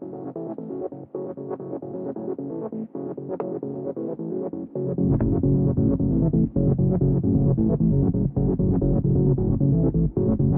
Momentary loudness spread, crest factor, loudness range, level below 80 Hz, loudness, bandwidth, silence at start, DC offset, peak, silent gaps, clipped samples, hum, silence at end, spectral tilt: 12 LU; 14 dB; 10 LU; -36 dBFS; -24 LUFS; 1.9 kHz; 0 s; under 0.1%; -8 dBFS; none; under 0.1%; none; 0 s; -15.5 dB/octave